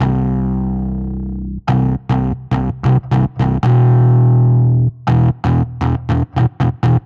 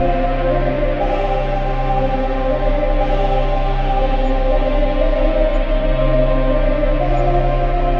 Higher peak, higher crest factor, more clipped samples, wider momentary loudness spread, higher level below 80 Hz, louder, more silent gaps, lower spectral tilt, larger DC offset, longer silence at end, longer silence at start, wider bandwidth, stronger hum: about the same, -4 dBFS vs -4 dBFS; about the same, 10 dB vs 12 dB; neither; first, 9 LU vs 2 LU; second, -28 dBFS vs -18 dBFS; first, -15 LUFS vs -18 LUFS; neither; first, -10 dB/octave vs -8.5 dB/octave; second, under 0.1% vs 0.3%; about the same, 0.05 s vs 0 s; about the same, 0 s vs 0 s; about the same, 4.9 kHz vs 5 kHz; neither